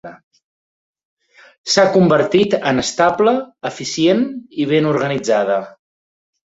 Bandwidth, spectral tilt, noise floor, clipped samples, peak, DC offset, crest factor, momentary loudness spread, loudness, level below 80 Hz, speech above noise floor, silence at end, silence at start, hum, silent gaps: 8 kHz; -5 dB/octave; under -90 dBFS; under 0.1%; 0 dBFS; under 0.1%; 16 dB; 10 LU; -16 LUFS; -56 dBFS; over 74 dB; 0.8 s; 0.05 s; none; 0.23-0.31 s, 0.44-0.94 s, 1.05-1.17 s, 1.58-1.64 s